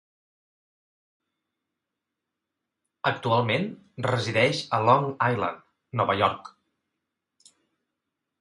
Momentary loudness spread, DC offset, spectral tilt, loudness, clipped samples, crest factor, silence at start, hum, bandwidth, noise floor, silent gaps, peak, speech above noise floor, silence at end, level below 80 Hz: 11 LU; under 0.1%; -5.5 dB/octave; -25 LUFS; under 0.1%; 24 dB; 3.05 s; none; 11.5 kHz; -85 dBFS; none; -6 dBFS; 60 dB; 1.9 s; -62 dBFS